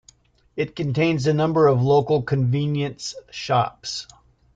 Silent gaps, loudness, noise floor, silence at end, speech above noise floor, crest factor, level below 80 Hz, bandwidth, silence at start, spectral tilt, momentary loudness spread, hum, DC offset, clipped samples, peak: none; -21 LUFS; -56 dBFS; 0.5 s; 35 dB; 16 dB; -56 dBFS; 9 kHz; 0.55 s; -6.5 dB/octave; 14 LU; none; under 0.1%; under 0.1%; -6 dBFS